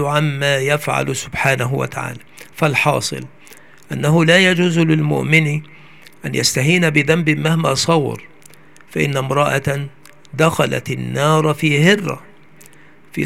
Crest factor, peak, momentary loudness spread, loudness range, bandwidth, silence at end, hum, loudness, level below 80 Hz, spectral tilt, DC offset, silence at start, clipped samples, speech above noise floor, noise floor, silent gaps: 18 dB; 0 dBFS; 15 LU; 4 LU; 16 kHz; 0 s; none; -16 LUFS; -54 dBFS; -5 dB/octave; 0.6%; 0 s; under 0.1%; 31 dB; -47 dBFS; none